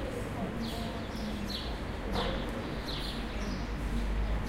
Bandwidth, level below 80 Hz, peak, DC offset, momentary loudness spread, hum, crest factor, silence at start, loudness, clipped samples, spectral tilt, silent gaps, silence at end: 16 kHz; -38 dBFS; -20 dBFS; under 0.1%; 3 LU; none; 14 dB; 0 s; -36 LUFS; under 0.1%; -5.5 dB/octave; none; 0 s